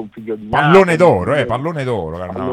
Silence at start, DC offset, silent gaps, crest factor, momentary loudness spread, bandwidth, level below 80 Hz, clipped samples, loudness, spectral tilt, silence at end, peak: 0 s; under 0.1%; none; 14 dB; 15 LU; 12 kHz; -46 dBFS; 0.2%; -14 LUFS; -7 dB/octave; 0 s; 0 dBFS